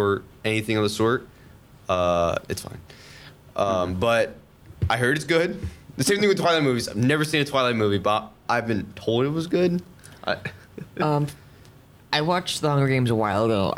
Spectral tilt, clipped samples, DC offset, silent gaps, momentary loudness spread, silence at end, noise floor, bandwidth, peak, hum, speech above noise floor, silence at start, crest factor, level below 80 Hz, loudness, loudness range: -5 dB/octave; under 0.1%; under 0.1%; none; 12 LU; 0 s; -50 dBFS; 17 kHz; -6 dBFS; none; 27 dB; 0 s; 18 dB; -50 dBFS; -23 LUFS; 4 LU